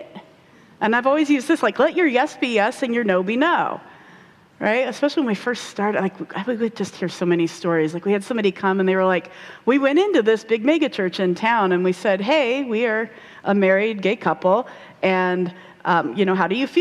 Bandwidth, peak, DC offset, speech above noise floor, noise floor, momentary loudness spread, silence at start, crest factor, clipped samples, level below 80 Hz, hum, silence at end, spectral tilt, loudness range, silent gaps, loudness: 12.5 kHz; -4 dBFS; under 0.1%; 30 dB; -50 dBFS; 8 LU; 0 s; 16 dB; under 0.1%; -68 dBFS; none; 0 s; -6 dB/octave; 4 LU; none; -20 LUFS